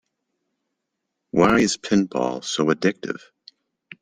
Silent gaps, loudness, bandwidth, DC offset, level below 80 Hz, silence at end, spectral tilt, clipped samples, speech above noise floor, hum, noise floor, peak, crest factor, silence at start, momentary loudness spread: none; -21 LUFS; 10.5 kHz; under 0.1%; -54 dBFS; 0.85 s; -4.5 dB/octave; under 0.1%; 59 dB; none; -80 dBFS; -4 dBFS; 20 dB; 1.35 s; 14 LU